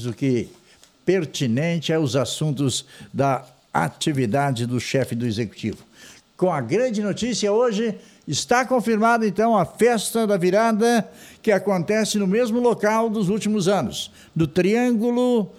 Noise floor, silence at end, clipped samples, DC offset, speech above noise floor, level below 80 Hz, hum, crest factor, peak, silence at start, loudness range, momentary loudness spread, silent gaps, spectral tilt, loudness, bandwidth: -49 dBFS; 0.1 s; under 0.1%; under 0.1%; 28 dB; -58 dBFS; none; 16 dB; -6 dBFS; 0 s; 4 LU; 9 LU; none; -5.5 dB/octave; -21 LUFS; 15.5 kHz